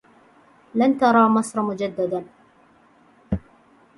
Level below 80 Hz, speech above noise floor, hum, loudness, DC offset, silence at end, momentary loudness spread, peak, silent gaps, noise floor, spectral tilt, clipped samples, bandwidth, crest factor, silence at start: -48 dBFS; 36 dB; none; -21 LUFS; under 0.1%; 0.6 s; 14 LU; -4 dBFS; none; -55 dBFS; -6.5 dB/octave; under 0.1%; 11.5 kHz; 20 dB; 0.75 s